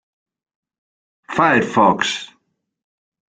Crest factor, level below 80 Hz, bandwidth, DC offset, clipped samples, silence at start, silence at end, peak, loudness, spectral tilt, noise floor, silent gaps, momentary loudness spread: 20 dB; -58 dBFS; 9.4 kHz; under 0.1%; under 0.1%; 1.3 s; 1.1 s; -2 dBFS; -17 LUFS; -4.5 dB/octave; -68 dBFS; none; 10 LU